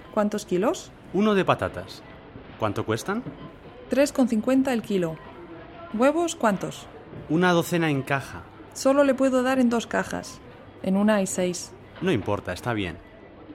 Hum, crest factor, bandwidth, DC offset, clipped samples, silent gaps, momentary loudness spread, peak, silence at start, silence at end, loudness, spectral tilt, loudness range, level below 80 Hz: none; 20 dB; 16 kHz; under 0.1%; under 0.1%; none; 20 LU; -6 dBFS; 0 s; 0 s; -25 LUFS; -5.5 dB/octave; 4 LU; -54 dBFS